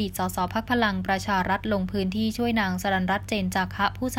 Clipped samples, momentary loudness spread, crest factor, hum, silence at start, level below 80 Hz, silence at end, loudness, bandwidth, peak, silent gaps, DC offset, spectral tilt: under 0.1%; 3 LU; 16 dB; none; 0 s; -44 dBFS; 0 s; -26 LUFS; 16.5 kHz; -10 dBFS; none; under 0.1%; -5 dB/octave